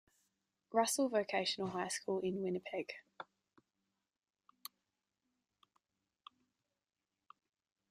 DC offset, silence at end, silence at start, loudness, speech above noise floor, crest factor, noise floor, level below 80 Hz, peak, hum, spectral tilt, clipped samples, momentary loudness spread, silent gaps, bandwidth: under 0.1%; 4.65 s; 0.7 s; -38 LUFS; over 52 dB; 24 dB; under -90 dBFS; -84 dBFS; -18 dBFS; none; -3.5 dB/octave; under 0.1%; 20 LU; none; 14.5 kHz